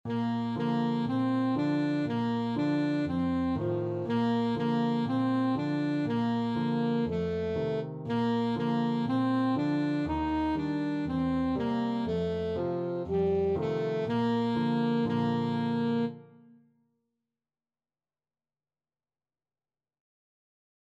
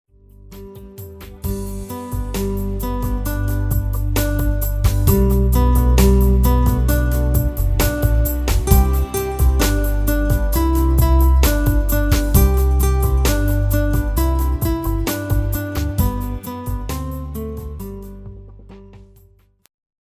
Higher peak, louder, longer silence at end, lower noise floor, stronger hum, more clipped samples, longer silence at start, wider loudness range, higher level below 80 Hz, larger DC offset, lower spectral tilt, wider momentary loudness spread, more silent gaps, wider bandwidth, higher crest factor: second, -18 dBFS vs 0 dBFS; second, -30 LUFS vs -18 LUFS; first, 4.7 s vs 1 s; first, under -90 dBFS vs -52 dBFS; neither; neither; second, 0.05 s vs 0.45 s; second, 2 LU vs 10 LU; second, -56 dBFS vs -18 dBFS; neither; first, -8.5 dB/octave vs -6 dB/octave; second, 3 LU vs 14 LU; neither; second, 7.6 kHz vs 16 kHz; about the same, 12 dB vs 16 dB